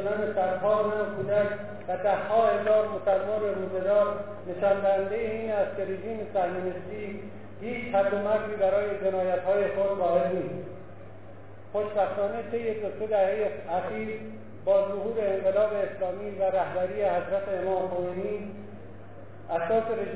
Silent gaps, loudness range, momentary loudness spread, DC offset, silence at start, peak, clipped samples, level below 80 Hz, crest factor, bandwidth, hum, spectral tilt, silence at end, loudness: none; 4 LU; 14 LU; 0.6%; 0 s; -12 dBFS; under 0.1%; -60 dBFS; 16 dB; 4 kHz; none; -10 dB/octave; 0 s; -28 LUFS